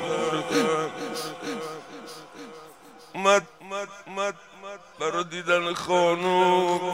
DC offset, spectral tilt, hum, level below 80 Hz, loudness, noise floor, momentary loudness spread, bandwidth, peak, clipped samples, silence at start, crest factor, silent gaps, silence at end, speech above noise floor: under 0.1%; -4 dB/octave; none; -70 dBFS; -25 LUFS; -49 dBFS; 20 LU; 16 kHz; -6 dBFS; under 0.1%; 0 s; 20 dB; none; 0 s; 26 dB